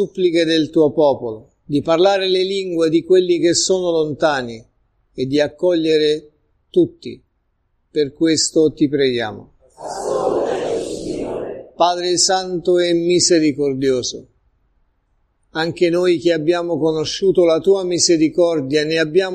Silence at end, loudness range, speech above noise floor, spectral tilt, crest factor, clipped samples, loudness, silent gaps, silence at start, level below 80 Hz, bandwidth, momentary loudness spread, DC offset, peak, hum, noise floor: 0 s; 4 LU; 49 dB; -4 dB/octave; 16 dB; under 0.1%; -17 LUFS; none; 0 s; -52 dBFS; 10.5 kHz; 12 LU; under 0.1%; -2 dBFS; none; -66 dBFS